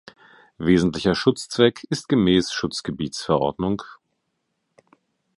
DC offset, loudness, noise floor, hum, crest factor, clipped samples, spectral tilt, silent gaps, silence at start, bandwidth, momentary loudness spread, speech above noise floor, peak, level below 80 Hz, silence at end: under 0.1%; -22 LUFS; -75 dBFS; none; 20 dB; under 0.1%; -5.5 dB/octave; none; 0.6 s; 11.5 kHz; 10 LU; 54 dB; -2 dBFS; -48 dBFS; 1.45 s